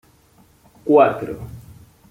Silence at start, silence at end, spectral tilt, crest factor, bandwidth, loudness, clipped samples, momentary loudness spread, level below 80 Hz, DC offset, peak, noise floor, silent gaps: 0.85 s; 0.5 s; -8 dB/octave; 18 dB; 16 kHz; -17 LUFS; under 0.1%; 20 LU; -52 dBFS; under 0.1%; -2 dBFS; -54 dBFS; none